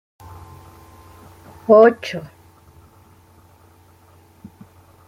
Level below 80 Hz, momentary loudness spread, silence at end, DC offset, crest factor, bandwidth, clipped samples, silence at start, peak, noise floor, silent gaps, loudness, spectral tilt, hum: -58 dBFS; 30 LU; 2.85 s; under 0.1%; 20 dB; 15.5 kHz; under 0.1%; 1.7 s; -2 dBFS; -51 dBFS; none; -14 LUFS; -6.5 dB/octave; none